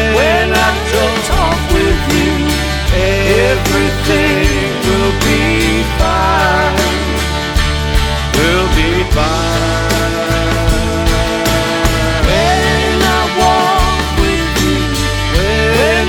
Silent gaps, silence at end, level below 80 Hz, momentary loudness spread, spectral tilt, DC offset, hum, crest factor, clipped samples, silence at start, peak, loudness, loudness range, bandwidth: none; 0 s; -18 dBFS; 3 LU; -4.5 dB/octave; under 0.1%; none; 12 dB; under 0.1%; 0 s; 0 dBFS; -12 LUFS; 1 LU; over 20 kHz